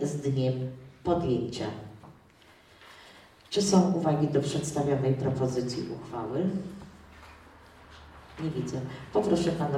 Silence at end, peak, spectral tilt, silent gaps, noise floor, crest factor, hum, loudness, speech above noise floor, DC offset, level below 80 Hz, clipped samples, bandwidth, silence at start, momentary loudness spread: 0 s; -8 dBFS; -6.5 dB/octave; none; -57 dBFS; 22 dB; none; -29 LUFS; 29 dB; under 0.1%; -56 dBFS; under 0.1%; 14 kHz; 0 s; 24 LU